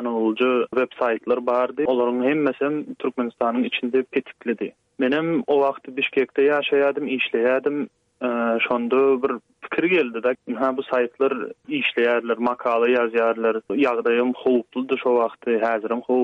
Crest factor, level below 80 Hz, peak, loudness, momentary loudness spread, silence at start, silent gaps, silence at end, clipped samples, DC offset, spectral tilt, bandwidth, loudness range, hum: 14 dB; -70 dBFS; -8 dBFS; -22 LUFS; 7 LU; 0 s; none; 0 s; under 0.1%; under 0.1%; -7 dB/octave; 5.6 kHz; 2 LU; none